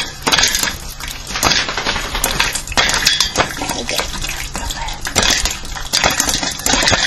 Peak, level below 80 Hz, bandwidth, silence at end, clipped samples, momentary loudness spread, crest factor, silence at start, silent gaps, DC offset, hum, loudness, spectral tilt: 0 dBFS; -28 dBFS; 19.5 kHz; 0 s; under 0.1%; 11 LU; 18 dB; 0 s; none; under 0.1%; none; -15 LUFS; -1 dB/octave